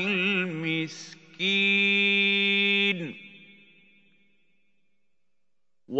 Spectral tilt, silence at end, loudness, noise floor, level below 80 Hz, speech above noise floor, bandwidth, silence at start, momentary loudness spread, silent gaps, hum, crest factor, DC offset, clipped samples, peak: -4.5 dB/octave; 0 s; -23 LUFS; -86 dBFS; -82 dBFS; 59 dB; 8 kHz; 0 s; 18 LU; none; none; 18 dB; under 0.1%; under 0.1%; -10 dBFS